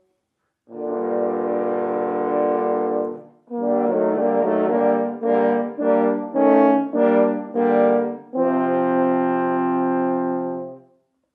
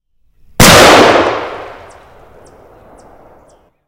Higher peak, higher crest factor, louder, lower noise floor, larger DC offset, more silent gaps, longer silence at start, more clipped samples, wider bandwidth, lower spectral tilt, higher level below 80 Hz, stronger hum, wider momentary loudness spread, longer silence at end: about the same, -2 dBFS vs 0 dBFS; first, 18 dB vs 12 dB; second, -20 LUFS vs -5 LUFS; first, -75 dBFS vs -47 dBFS; neither; neither; about the same, 0.7 s vs 0.6 s; second, under 0.1% vs 2%; second, 4 kHz vs over 20 kHz; first, -10.5 dB/octave vs -3 dB/octave; second, -86 dBFS vs -30 dBFS; neither; second, 9 LU vs 24 LU; second, 0.55 s vs 2.2 s